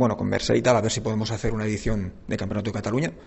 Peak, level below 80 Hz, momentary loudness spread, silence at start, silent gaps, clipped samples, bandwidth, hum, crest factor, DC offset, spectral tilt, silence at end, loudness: -6 dBFS; -40 dBFS; 8 LU; 0 s; none; under 0.1%; 8.4 kHz; none; 18 dB; under 0.1%; -5.5 dB/octave; 0 s; -25 LUFS